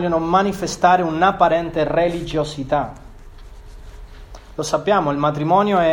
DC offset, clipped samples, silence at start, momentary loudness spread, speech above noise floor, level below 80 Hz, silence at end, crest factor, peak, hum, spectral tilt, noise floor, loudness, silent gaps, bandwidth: under 0.1%; under 0.1%; 0 s; 8 LU; 21 dB; -40 dBFS; 0 s; 18 dB; 0 dBFS; none; -5.5 dB/octave; -38 dBFS; -18 LUFS; none; 16.5 kHz